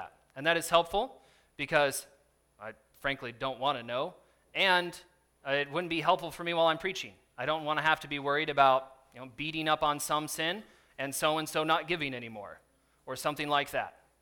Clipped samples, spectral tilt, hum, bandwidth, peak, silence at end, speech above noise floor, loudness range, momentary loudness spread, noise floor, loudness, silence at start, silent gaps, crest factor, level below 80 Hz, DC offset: under 0.1%; -3 dB/octave; none; 19 kHz; -8 dBFS; 0.3 s; 32 dB; 4 LU; 18 LU; -63 dBFS; -31 LUFS; 0 s; none; 24 dB; -64 dBFS; under 0.1%